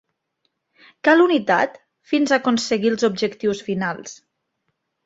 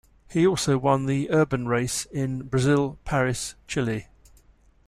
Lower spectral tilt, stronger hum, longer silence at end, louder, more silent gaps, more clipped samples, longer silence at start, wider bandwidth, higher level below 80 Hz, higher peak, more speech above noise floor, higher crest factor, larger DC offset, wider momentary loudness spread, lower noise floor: about the same, -4.5 dB/octave vs -5.5 dB/octave; neither; about the same, 0.9 s vs 0.85 s; first, -19 LUFS vs -25 LUFS; neither; neither; first, 1.05 s vs 0.3 s; second, 8 kHz vs 14.5 kHz; second, -64 dBFS vs -48 dBFS; first, -2 dBFS vs -8 dBFS; first, 55 dB vs 34 dB; about the same, 20 dB vs 18 dB; neither; about the same, 10 LU vs 8 LU; first, -74 dBFS vs -57 dBFS